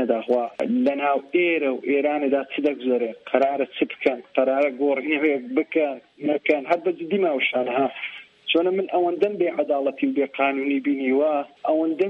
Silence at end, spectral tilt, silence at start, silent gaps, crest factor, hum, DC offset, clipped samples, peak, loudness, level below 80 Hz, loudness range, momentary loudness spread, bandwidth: 0 s; -7 dB/octave; 0 s; none; 18 dB; none; under 0.1%; under 0.1%; -4 dBFS; -23 LUFS; -74 dBFS; 1 LU; 4 LU; 6.2 kHz